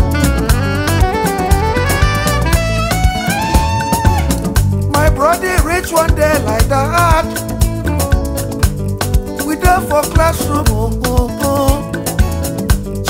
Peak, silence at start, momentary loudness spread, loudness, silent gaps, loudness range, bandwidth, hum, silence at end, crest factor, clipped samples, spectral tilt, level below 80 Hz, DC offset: 0 dBFS; 0 s; 5 LU; -14 LUFS; none; 2 LU; 16.5 kHz; none; 0 s; 12 dB; under 0.1%; -5 dB/octave; -18 dBFS; under 0.1%